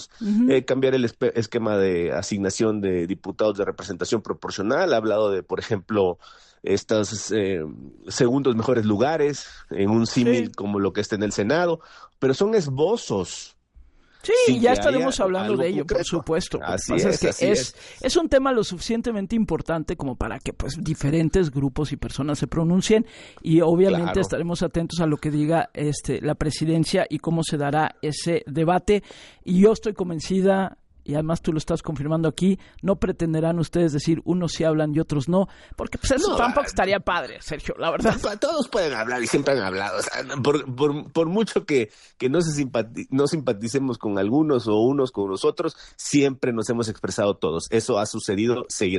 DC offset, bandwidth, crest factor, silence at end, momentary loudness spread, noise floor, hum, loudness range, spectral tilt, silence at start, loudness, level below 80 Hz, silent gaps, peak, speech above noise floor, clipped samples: under 0.1%; 11.5 kHz; 16 dB; 0 s; 8 LU; -52 dBFS; none; 2 LU; -5.5 dB/octave; 0 s; -23 LUFS; -44 dBFS; none; -6 dBFS; 29 dB; under 0.1%